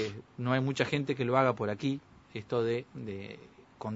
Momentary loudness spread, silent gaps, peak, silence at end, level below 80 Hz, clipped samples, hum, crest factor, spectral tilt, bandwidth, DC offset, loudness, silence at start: 17 LU; none; -10 dBFS; 0 s; -68 dBFS; under 0.1%; none; 22 dB; -6.5 dB/octave; 8 kHz; under 0.1%; -32 LUFS; 0 s